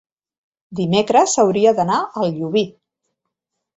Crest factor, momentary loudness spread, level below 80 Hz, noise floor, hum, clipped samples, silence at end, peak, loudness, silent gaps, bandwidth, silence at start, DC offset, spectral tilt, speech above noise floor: 18 dB; 10 LU; -60 dBFS; -78 dBFS; none; under 0.1%; 1.1 s; -2 dBFS; -17 LUFS; none; 8.2 kHz; 0.7 s; under 0.1%; -4.5 dB/octave; 62 dB